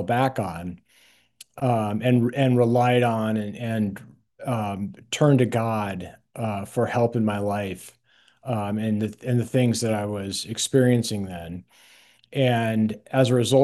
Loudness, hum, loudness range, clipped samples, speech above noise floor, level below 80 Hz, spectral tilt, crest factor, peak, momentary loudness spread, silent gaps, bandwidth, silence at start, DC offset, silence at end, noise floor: -24 LUFS; none; 3 LU; under 0.1%; 36 dB; -64 dBFS; -6 dB/octave; 18 dB; -6 dBFS; 14 LU; none; 12.5 kHz; 0 s; under 0.1%; 0 s; -59 dBFS